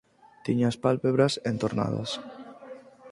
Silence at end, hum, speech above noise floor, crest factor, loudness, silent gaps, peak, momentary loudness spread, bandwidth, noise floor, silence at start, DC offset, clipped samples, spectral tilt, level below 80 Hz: 0 s; none; 20 dB; 20 dB; -27 LUFS; none; -8 dBFS; 21 LU; 11.5 kHz; -46 dBFS; 0.45 s; under 0.1%; under 0.1%; -6.5 dB/octave; -62 dBFS